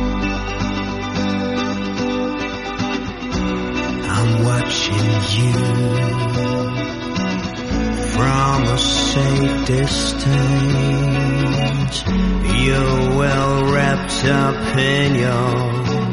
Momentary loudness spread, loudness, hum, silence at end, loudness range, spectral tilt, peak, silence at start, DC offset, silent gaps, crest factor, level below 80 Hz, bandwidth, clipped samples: 6 LU; -18 LUFS; none; 0 s; 5 LU; -5.5 dB/octave; -2 dBFS; 0 s; under 0.1%; none; 16 dB; -30 dBFS; 11.5 kHz; under 0.1%